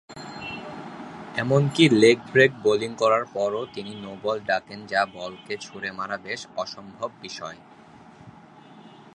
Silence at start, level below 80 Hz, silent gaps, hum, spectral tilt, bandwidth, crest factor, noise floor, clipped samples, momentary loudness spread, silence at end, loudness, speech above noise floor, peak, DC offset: 0.1 s; -64 dBFS; none; none; -5.5 dB/octave; 11.5 kHz; 24 dB; -48 dBFS; under 0.1%; 18 LU; 0.3 s; -24 LUFS; 25 dB; -2 dBFS; under 0.1%